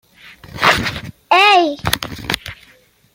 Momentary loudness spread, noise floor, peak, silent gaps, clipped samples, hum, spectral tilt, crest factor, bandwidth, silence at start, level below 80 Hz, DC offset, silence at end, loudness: 19 LU; -51 dBFS; 0 dBFS; none; under 0.1%; none; -3 dB/octave; 18 dB; 17 kHz; 0.25 s; -42 dBFS; under 0.1%; 0.6 s; -15 LUFS